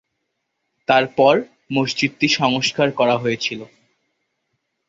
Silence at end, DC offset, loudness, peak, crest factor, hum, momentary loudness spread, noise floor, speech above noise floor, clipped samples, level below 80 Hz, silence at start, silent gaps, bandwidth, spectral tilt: 1.2 s; under 0.1%; -18 LUFS; -2 dBFS; 20 dB; none; 9 LU; -75 dBFS; 57 dB; under 0.1%; -62 dBFS; 0.9 s; none; 8 kHz; -4.5 dB/octave